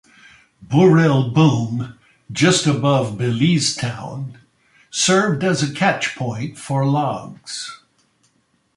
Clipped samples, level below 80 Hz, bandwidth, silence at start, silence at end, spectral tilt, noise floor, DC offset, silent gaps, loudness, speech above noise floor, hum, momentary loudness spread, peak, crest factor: under 0.1%; -56 dBFS; 11.5 kHz; 0.6 s; 1 s; -5 dB/octave; -63 dBFS; under 0.1%; none; -18 LUFS; 46 dB; none; 15 LU; -2 dBFS; 16 dB